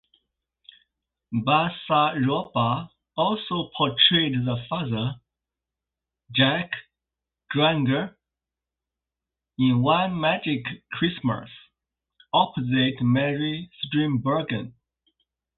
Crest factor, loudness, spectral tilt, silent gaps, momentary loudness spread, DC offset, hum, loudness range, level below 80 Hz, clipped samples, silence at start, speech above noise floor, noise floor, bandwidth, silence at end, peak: 20 dB; -24 LUFS; -10.5 dB/octave; none; 11 LU; under 0.1%; none; 4 LU; -58 dBFS; under 0.1%; 1.3 s; 65 dB; -88 dBFS; 4.3 kHz; 0.85 s; -4 dBFS